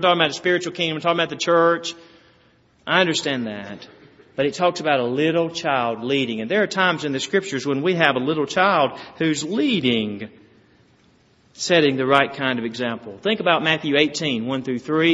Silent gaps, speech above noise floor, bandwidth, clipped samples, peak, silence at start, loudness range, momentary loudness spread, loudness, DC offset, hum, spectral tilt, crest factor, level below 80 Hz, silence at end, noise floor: none; 37 dB; 8 kHz; under 0.1%; 0 dBFS; 0 s; 3 LU; 9 LU; -20 LUFS; under 0.1%; none; -2.5 dB/octave; 22 dB; -64 dBFS; 0 s; -57 dBFS